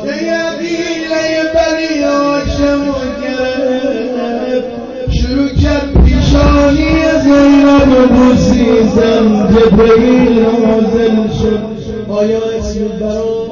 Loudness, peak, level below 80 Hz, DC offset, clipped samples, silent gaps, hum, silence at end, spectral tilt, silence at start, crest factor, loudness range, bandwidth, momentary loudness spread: -11 LUFS; 0 dBFS; -20 dBFS; under 0.1%; under 0.1%; none; none; 0 s; -6.5 dB/octave; 0 s; 8 dB; 7 LU; 7.2 kHz; 10 LU